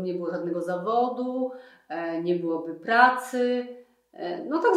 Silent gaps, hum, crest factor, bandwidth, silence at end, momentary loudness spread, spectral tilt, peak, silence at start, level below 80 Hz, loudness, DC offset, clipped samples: none; none; 22 dB; 15 kHz; 0 s; 15 LU; -5.5 dB/octave; -4 dBFS; 0 s; -84 dBFS; -26 LUFS; under 0.1%; under 0.1%